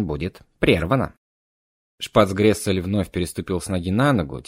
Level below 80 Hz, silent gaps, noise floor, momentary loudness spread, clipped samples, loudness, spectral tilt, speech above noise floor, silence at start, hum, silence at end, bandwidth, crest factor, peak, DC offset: -42 dBFS; 1.17-1.98 s; under -90 dBFS; 10 LU; under 0.1%; -21 LUFS; -6 dB/octave; over 69 dB; 0 s; none; 0.05 s; 16 kHz; 20 dB; 0 dBFS; under 0.1%